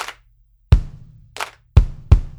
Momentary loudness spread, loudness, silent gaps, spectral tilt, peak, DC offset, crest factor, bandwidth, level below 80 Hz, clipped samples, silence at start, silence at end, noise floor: 17 LU; -20 LUFS; none; -6.5 dB/octave; 0 dBFS; under 0.1%; 18 dB; 12.5 kHz; -20 dBFS; 0.2%; 0 s; 0.1 s; -55 dBFS